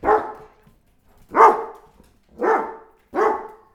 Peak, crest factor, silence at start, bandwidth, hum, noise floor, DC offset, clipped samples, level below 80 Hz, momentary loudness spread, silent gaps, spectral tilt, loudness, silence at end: 0 dBFS; 22 dB; 0.05 s; 13 kHz; none; -56 dBFS; under 0.1%; under 0.1%; -54 dBFS; 19 LU; none; -5.5 dB/octave; -19 LUFS; 0.25 s